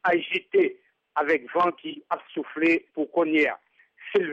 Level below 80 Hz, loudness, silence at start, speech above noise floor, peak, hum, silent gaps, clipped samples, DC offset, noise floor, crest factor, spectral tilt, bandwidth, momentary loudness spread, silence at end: -72 dBFS; -25 LUFS; 0.05 s; 20 dB; -12 dBFS; none; none; under 0.1%; under 0.1%; -44 dBFS; 14 dB; -6 dB/octave; 7.6 kHz; 10 LU; 0 s